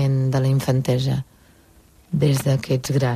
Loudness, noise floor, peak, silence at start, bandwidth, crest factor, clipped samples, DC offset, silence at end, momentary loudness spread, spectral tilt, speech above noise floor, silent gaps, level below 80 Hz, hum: -21 LUFS; -52 dBFS; -8 dBFS; 0 s; 15 kHz; 14 dB; under 0.1%; under 0.1%; 0 s; 8 LU; -6.5 dB/octave; 33 dB; none; -50 dBFS; none